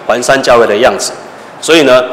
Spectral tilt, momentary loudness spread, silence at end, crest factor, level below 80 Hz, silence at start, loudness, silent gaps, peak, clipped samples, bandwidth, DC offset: -3 dB/octave; 13 LU; 0 s; 8 dB; -42 dBFS; 0 s; -8 LUFS; none; 0 dBFS; 0.8%; 16 kHz; under 0.1%